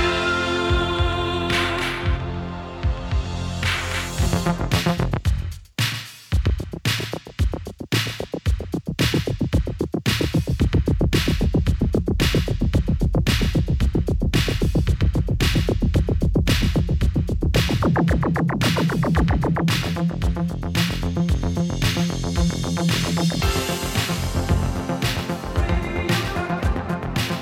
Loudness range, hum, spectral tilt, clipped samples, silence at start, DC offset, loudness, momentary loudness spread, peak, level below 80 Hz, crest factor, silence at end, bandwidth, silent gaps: 4 LU; none; -5.5 dB/octave; under 0.1%; 0 s; under 0.1%; -22 LUFS; 6 LU; -6 dBFS; -26 dBFS; 14 dB; 0 s; 16.5 kHz; none